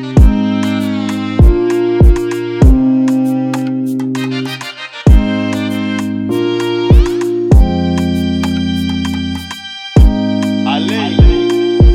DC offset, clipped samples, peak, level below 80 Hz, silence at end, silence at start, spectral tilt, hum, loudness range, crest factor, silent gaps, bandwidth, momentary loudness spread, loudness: under 0.1%; under 0.1%; 0 dBFS; -14 dBFS; 0 s; 0 s; -7 dB/octave; none; 3 LU; 10 dB; none; 13.5 kHz; 8 LU; -13 LUFS